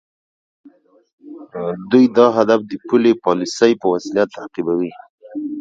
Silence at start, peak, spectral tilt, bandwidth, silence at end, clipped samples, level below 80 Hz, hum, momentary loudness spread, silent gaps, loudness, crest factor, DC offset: 1.25 s; 0 dBFS; -5.5 dB/octave; 7.8 kHz; 0 s; under 0.1%; -62 dBFS; none; 14 LU; 5.09-5.18 s; -17 LUFS; 18 dB; under 0.1%